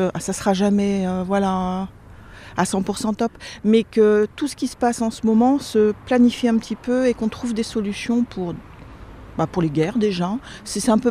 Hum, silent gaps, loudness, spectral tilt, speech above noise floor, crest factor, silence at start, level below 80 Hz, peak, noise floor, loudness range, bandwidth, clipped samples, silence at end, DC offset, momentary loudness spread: none; none; -21 LUFS; -6 dB/octave; 21 dB; 16 dB; 0 s; -46 dBFS; -4 dBFS; -41 dBFS; 5 LU; 14.5 kHz; under 0.1%; 0 s; under 0.1%; 9 LU